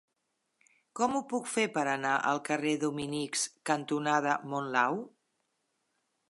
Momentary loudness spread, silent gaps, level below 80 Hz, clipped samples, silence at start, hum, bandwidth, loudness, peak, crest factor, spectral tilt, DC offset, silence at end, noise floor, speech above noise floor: 4 LU; none; -78 dBFS; under 0.1%; 0.95 s; none; 11.5 kHz; -31 LUFS; -12 dBFS; 20 dB; -3.5 dB/octave; under 0.1%; 1.2 s; -81 dBFS; 50 dB